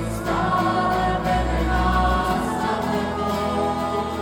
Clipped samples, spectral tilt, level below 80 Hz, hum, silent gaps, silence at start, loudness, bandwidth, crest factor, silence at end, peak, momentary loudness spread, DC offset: under 0.1%; -6 dB/octave; -30 dBFS; none; none; 0 s; -22 LUFS; 17.5 kHz; 14 dB; 0 s; -8 dBFS; 4 LU; under 0.1%